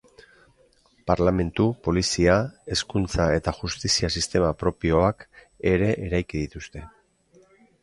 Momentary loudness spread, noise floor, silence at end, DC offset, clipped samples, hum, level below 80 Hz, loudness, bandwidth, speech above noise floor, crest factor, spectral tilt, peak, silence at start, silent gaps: 11 LU; -60 dBFS; 0.95 s; under 0.1%; under 0.1%; none; -38 dBFS; -24 LUFS; 11.5 kHz; 37 dB; 20 dB; -5 dB/octave; -4 dBFS; 1.05 s; none